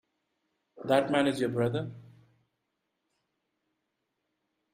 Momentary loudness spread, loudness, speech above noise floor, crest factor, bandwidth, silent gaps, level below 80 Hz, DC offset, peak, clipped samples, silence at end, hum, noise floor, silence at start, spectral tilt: 15 LU; -28 LUFS; 54 dB; 24 dB; 15.5 kHz; none; -70 dBFS; under 0.1%; -10 dBFS; under 0.1%; 2.75 s; none; -82 dBFS; 0.75 s; -6 dB/octave